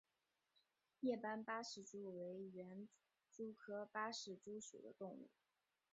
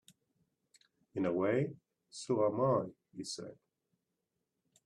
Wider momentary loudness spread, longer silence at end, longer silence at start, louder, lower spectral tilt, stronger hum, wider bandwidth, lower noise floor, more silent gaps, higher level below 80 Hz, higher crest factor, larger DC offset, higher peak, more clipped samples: second, 12 LU vs 16 LU; second, 0.65 s vs 1.35 s; second, 1 s vs 1.15 s; second, -51 LUFS vs -35 LUFS; second, -3.5 dB/octave vs -6 dB/octave; neither; second, 7.6 kHz vs 11.5 kHz; first, under -90 dBFS vs -86 dBFS; neither; second, under -90 dBFS vs -78 dBFS; about the same, 20 dB vs 20 dB; neither; second, -32 dBFS vs -18 dBFS; neither